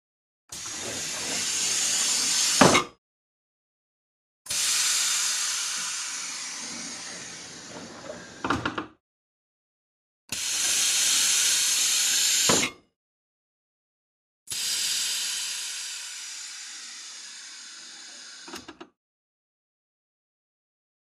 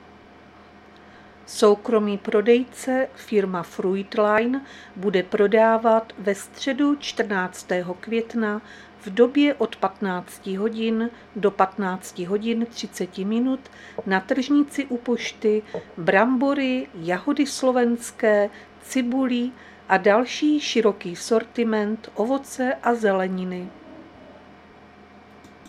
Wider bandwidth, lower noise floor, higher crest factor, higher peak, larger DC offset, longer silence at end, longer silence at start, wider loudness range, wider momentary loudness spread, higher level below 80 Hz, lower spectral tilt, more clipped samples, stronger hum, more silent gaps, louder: about the same, 15.5 kHz vs 14.5 kHz; first, under -90 dBFS vs -48 dBFS; first, 28 dB vs 20 dB; about the same, -2 dBFS vs -2 dBFS; neither; first, 2.15 s vs 0.2 s; second, 0.5 s vs 1.5 s; first, 17 LU vs 4 LU; first, 20 LU vs 11 LU; about the same, -62 dBFS vs -64 dBFS; second, -0.5 dB/octave vs -5 dB/octave; neither; neither; first, 2.98-4.45 s, 9.00-10.28 s, 12.96-14.46 s vs none; about the same, -23 LUFS vs -23 LUFS